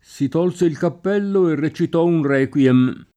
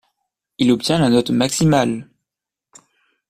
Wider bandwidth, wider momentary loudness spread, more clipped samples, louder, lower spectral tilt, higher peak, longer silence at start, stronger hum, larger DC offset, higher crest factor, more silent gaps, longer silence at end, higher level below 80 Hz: second, 10 kHz vs 15 kHz; about the same, 6 LU vs 6 LU; neither; about the same, -18 LUFS vs -17 LUFS; first, -8 dB/octave vs -5 dB/octave; about the same, -4 dBFS vs -2 dBFS; second, 0.15 s vs 0.6 s; neither; neither; about the same, 14 dB vs 18 dB; neither; second, 0.15 s vs 1.25 s; second, -60 dBFS vs -48 dBFS